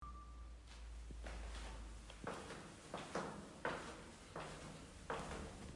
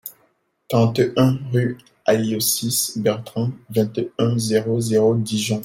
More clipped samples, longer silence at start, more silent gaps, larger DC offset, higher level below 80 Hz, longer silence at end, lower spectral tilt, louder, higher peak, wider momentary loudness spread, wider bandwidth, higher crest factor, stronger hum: neither; about the same, 0 s vs 0.05 s; neither; neither; about the same, -56 dBFS vs -58 dBFS; about the same, 0 s vs 0 s; about the same, -4.5 dB/octave vs -5 dB/octave; second, -51 LUFS vs -20 LUFS; second, -28 dBFS vs -4 dBFS; first, 10 LU vs 7 LU; second, 11.5 kHz vs 16.5 kHz; first, 24 dB vs 16 dB; neither